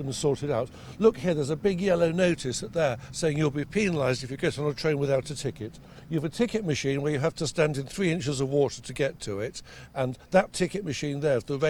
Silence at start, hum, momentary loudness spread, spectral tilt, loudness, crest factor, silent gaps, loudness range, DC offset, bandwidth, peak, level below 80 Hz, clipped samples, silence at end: 0 s; none; 9 LU; -5.5 dB/octave; -27 LUFS; 20 dB; none; 2 LU; under 0.1%; 19 kHz; -8 dBFS; -52 dBFS; under 0.1%; 0 s